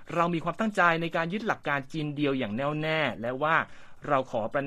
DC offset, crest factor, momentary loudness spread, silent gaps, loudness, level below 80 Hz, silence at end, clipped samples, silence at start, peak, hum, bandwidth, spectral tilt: under 0.1%; 20 dB; 6 LU; none; -28 LUFS; -58 dBFS; 0 s; under 0.1%; 0 s; -8 dBFS; none; 13 kHz; -6.5 dB/octave